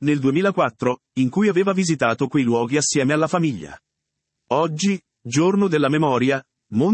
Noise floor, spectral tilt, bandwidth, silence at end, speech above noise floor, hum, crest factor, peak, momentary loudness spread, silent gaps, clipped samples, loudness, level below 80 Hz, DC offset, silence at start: -79 dBFS; -5.5 dB/octave; 8.8 kHz; 0 s; 60 dB; none; 16 dB; -4 dBFS; 6 LU; none; under 0.1%; -20 LUFS; -64 dBFS; under 0.1%; 0 s